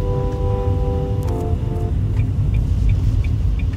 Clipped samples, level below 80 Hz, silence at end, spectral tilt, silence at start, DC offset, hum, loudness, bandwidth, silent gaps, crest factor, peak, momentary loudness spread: under 0.1%; -22 dBFS; 0 s; -9 dB/octave; 0 s; under 0.1%; none; -20 LUFS; 7.8 kHz; none; 12 dB; -6 dBFS; 3 LU